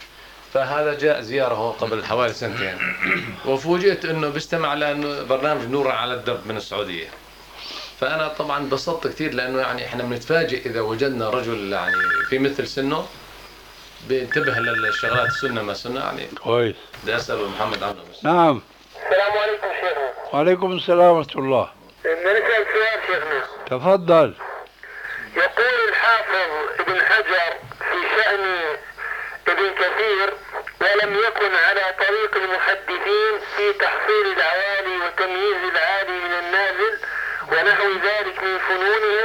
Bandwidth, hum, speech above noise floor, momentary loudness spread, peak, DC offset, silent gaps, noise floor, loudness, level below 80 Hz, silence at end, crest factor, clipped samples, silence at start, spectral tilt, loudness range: 19 kHz; none; 23 dB; 10 LU; -4 dBFS; under 0.1%; none; -43 dBFS; -20 LUFS; -54 dBFS; 0 s; 16 dB; under 0.1%; 0 s; -5 dB/octave; 5 LU